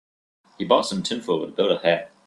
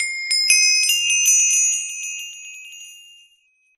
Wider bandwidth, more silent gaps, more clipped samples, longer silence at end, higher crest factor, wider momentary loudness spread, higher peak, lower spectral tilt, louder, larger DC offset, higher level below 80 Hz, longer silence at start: second, 12 kHz vs 14.5 kHz; neither; neither; second, 0.2 s vs 0.8 s; about the same, 22 dB vs 20 dB; second, 6 LU vs 22 LU; about the same, -2 dBFS vs 0 dBFS; first, -4.5 dB/octave vs 8 dB/octave; second, -22 LUFS vs -15 LUFS; neither; first, -66 dBFS vs -72 dBFS; first, 0.6 s vs 0 s